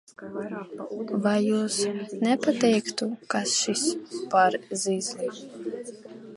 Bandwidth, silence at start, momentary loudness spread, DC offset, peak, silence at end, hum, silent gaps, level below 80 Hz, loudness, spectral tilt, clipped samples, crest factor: 11.5 kHz; 0.2 s; 14 LU; under 0.1%; -8 dBFS; 0 s; none; none; -76 dBFS; -26 LUFS; -3.5 dB/octave; under 0.1%; 20 dB